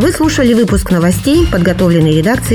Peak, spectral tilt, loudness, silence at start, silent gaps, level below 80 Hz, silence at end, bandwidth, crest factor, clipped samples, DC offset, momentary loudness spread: 0 dBFS; -6 dB/octave; -11 LUFS; 0 s; none; -24 dBFS; 0 s; 19 kHz; 10 dB; under 0.1%; under 0.1%; 2 LU